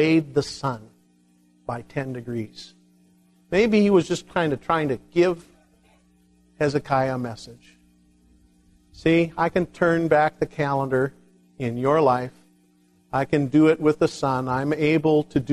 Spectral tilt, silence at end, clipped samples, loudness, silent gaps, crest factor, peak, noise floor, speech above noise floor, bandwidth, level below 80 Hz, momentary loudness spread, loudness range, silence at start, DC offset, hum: -7 dB/octave; 0 s; under 0.1%; -22 LUFS; none; 18 dB; -6 dBFS; -60 dBFS; 38 dB; 12 kHz; -54 dBFS; 14 LU; 7 LU; 0 s; under 0.1%; none